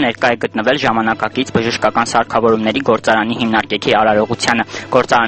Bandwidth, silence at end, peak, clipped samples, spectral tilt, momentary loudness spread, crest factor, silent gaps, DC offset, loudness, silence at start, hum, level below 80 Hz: 8.8 kHz; 0 s; 0 dBFS; under 0.1%; -4.5 dB/octave; 4 LU; 14 dB; none; under 0.1%; -15 LUFS; 0 s; none; -46 dBFS